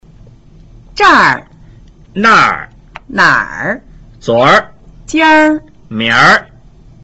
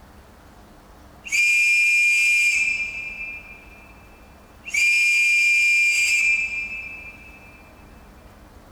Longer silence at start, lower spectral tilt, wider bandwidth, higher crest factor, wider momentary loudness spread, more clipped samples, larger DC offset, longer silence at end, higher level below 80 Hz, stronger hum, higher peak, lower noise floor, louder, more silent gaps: second, 0.95 s vs 1.25 s; first, -4 dB/octave vs 1 dB/octave; second, 8.2 kHz vs over 20 kHz; about the same, 12 dB vs 12 dB; about the same, 17 LU vs 18 LU; neither; neither; second, 0.6 s vs 1.25 s; first, -40 dBFS vs -52 dBFS; neither; first, 0 dBFS vs -10 dBFS; second, -39 dBFS vs -47 dBFS; first, -9 LUFS vs -17 LUFS; neither